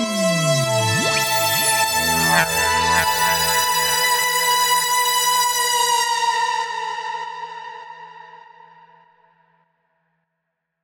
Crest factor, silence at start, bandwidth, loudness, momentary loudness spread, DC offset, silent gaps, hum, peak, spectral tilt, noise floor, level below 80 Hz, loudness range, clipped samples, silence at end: 18 dB; 0 s; over 20 kHz; -17 LUFS; 13 LU; under 0.1%; none; none; -4 dBFS; -1.5 dB/octave; -77 dBFS; -50 dBFS; 13 LU; under 0.1%; 2.45 s